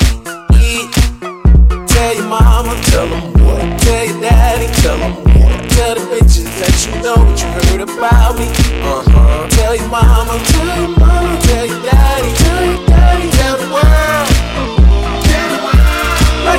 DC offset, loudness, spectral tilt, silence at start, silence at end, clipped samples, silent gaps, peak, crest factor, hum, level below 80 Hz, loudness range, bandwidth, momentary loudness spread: under 0.1%; -11 LUFS; -5 dB/octave; 0 s; 0 s; under 0.1%; none; 0 dBFS; 10 dB; none; -10 dBFS; 1 LU; 16 kHz; 4 LU